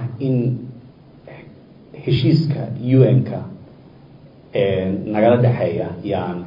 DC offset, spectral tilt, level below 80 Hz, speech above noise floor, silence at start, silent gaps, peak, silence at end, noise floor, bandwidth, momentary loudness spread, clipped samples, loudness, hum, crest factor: under 0.1%; -10.5 dB/octave; -54 dBFS; 27 dB; 0 s; none; 0 dBFS; 0 s; -44 dBFS; 5.4 kHz; 15 LU; under 0.1%; -18 LUFS; none; 18 dB